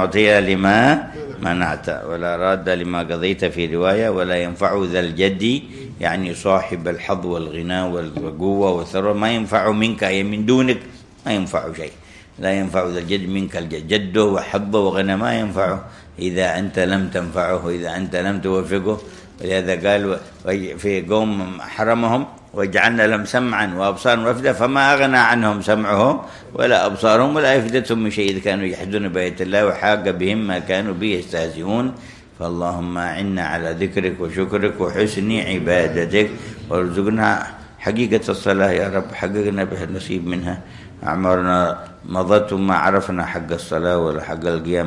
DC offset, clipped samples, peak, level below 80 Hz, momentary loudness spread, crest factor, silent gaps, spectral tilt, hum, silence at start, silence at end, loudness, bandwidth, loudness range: under 0.1%; under 0.1%; 0 dBFS; -48 dBFS; 10 LU; 18 dB; none; -5.5 dB/octave; none; 0 s; 0 s; -19 LUFS; 12 kHz; 5 LU